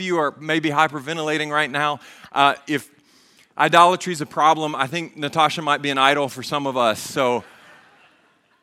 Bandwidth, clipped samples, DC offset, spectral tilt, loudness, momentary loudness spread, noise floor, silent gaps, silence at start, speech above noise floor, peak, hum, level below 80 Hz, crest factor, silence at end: 16 kHz; under 0.1%; under 0.1%; -4 dB/octave; -20 LUFS; 10 LU; -60 dBFS; none; 0 s; 39 dB; 0 dBFS; none; -70 dBFS; 22 dB; 1.2 s